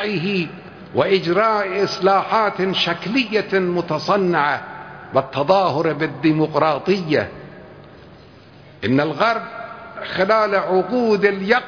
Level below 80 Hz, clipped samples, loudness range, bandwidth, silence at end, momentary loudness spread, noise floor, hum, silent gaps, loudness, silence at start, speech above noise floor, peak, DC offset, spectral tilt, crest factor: -58 dBFS; under 0.1%; 4 LU; 5.4 kHz; 0 s; 12 LU; -44 dBFS; none; none; -19 LUFS; 0 s; 26 dB; -2 dBFS; under 0.1%; -6 dB/octave; 18 dB